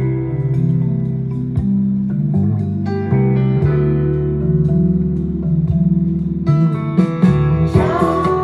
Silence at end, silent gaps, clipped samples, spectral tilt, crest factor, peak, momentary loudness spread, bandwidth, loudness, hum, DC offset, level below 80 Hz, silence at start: 0 s; none; under 0.1%; -10 dB/octave; 16 dB; 0 dBFS; 5 LU; 5.6 kHz; -16 LUFS; none; under 0.1%; -32 dBFS; 0 s